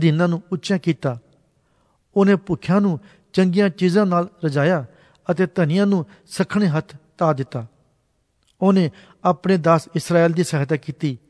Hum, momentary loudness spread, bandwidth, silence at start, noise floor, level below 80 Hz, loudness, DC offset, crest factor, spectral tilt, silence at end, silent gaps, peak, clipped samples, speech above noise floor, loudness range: none; 9 LU; 11 kHz; 0 s; -66 dBFS; -60 dBFS; -20 LUFS; under 0.1%; 18 dB; -7 dB/octave; 0.15 s; none; -2 dBFS; under 0.1%; 47 dB; 3 LU